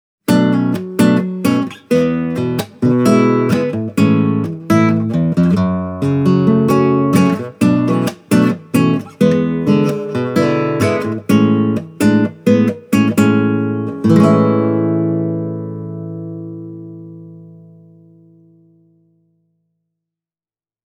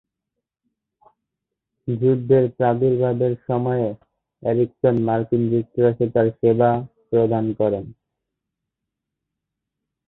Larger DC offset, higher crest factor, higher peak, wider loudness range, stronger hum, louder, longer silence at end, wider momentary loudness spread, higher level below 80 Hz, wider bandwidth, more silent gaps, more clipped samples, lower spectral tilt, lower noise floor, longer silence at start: neither; about the same, 14 dB vs 18 dB; first, 0 dBFS vs -4 dBFS; first, 8 LU vs 3 LU; neither; first, -14 LUFS vs -20 LUFS; first, 3.35 s vs 2.15 s; about the same, 10 LU vs 10 LU; about the same, -52 dBFS vs -56 dBFS; first, 19 kHz vs 4.1 kHz; neither; neither; second, -7.5 dB/octave vs -12.5 dB/octave; first, under -90 dBFS vs -83 dBFS; second, 0.3 s vs 1.85 s